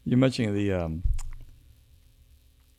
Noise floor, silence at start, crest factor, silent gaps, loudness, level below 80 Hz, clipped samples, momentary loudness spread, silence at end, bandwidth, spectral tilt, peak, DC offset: -58 dBFS; 0.05 s; 20 dB; none; -27 LUFS; -36 dBFS; under 0.1%; 13 LU; 1.25 s; 13 kHz; -7 dB/octave; -8 dBFS; under 0.1%